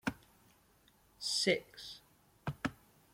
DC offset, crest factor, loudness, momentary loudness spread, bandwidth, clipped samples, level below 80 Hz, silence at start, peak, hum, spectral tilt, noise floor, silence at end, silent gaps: under 0.1%; 24 dB; -37 LUFS; 19 LU; 16.5 kHz; under 0.1%; -66 dBFS; 0.05 s; -16 dBFS; none; -3 dB/octave; -68 dBFS; 0.4 s; none